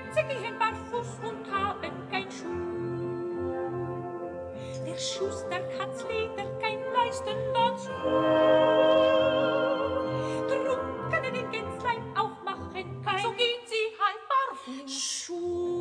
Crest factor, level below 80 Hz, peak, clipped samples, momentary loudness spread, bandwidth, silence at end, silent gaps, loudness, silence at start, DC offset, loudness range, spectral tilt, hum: 18 dB; -62 dBFS; -12 dBFS; under 0.1%; 13 LU; 10.5 kHz; 0 s; none; -29 LUFS; 0 s; under 0.1%; 9 LU; -4 dB/octave; none